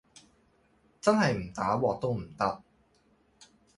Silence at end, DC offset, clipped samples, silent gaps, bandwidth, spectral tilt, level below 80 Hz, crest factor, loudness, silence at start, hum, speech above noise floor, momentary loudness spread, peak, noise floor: 0.35 s; under 0.1%; under 0.1%; none; 11.5 kHz; -6 dB/octave; -60 dBFS; 22 dB; -29 LUFS; 1.05 s; none; 39 dB; 8 LU; -10 dBFS; -67 dBFS